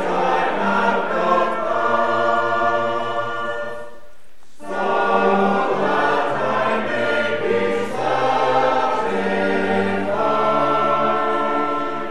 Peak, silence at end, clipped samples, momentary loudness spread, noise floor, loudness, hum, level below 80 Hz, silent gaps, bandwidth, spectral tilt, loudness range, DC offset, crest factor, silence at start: -4 dBFS; 0 s; under 0.1%; 6 LU; -53 dBFS; -19 LUFS; none; -56 dBFS; none; 12 kHz; -5.5 dB/octave; 3 LU; 3%; 16 dB; 0 s